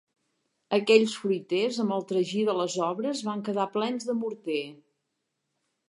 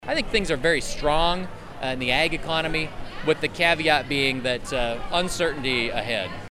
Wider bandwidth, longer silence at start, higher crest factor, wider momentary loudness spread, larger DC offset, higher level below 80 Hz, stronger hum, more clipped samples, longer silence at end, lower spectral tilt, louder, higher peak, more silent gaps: second, 11.5 kHz vs 14 kHz; first, 0.7 s vs 0 s; about the same, 22 dB vs 20 dB; first, 10 LU vs 7 LU; neither; second, -82 dBFS vs -36 dBFS; neither; neither; first, 1.15 s vs 0.05 s; about the same, -4.5 dB/octave vs -3.5 dB/octave; second, -27 LUFS vs -24 LUFS; about the same, -6 dBFS vs -4 dBFS; neither